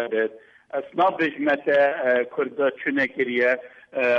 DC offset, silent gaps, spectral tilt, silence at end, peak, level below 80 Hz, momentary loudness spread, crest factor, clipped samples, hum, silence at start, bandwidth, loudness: under 0.1%; none; -6 dB/octave; 0 s; -10 dBFS; -70 dBFS; 9 LU; 14 dB; under 0.1%; none; 0 s; 7 kHz; -23 LUFS